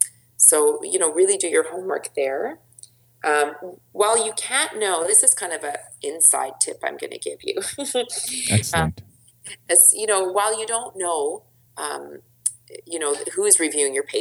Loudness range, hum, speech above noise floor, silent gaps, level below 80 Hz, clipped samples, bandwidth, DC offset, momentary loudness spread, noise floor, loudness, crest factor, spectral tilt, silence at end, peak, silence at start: 5 LU; none; 28 dB; none; -54 dBFS; under 0.1%; over 20 kHz; under 0.1%; 17 LU; -49 dBFS; -19 LUFS; 22 dB; -2 dB/octave; 0 s; 0 dBFS; 0 s